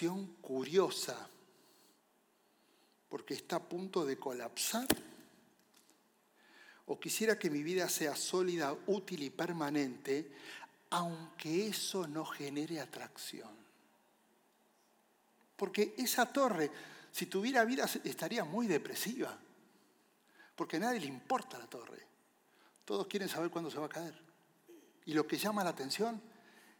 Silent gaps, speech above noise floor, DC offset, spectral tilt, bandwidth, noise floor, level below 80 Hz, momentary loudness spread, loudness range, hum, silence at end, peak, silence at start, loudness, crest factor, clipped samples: none; 36 dB; under 0.1%; -3.5 dB/octave; 19 kHz; -73 dBFS; -80 dBFS; 16 LU; 8 LU; none; 0.45 s; -10 dBFS; 0 s; -37 LUFS; 28 dB; under 0.1%